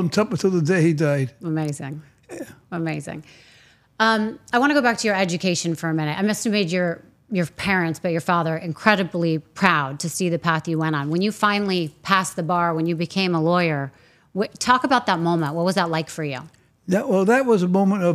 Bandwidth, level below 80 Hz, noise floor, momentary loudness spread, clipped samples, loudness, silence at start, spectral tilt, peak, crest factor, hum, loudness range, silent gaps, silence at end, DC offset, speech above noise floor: 14.5 kHz; -60 dBFS; -54 dBFS; 11 LU; under 0.1%; -21 LUFS; 0 s; -5.5 dB/octave; 0 dBFS; 22 dB; none; 3 LU; none; 0 s; under 0.1%; 33 dB